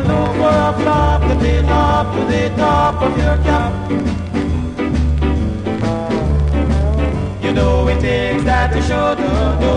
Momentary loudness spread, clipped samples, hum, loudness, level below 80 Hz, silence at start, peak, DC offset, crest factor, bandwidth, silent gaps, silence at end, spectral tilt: 5 LU; under 0.1%; none; -16 LUFS; -20 dBFS; 0 s; -2 dBFS; under 0.1%; 12 dB; 10 kHz; none; 0 s; -7.5 dB/octave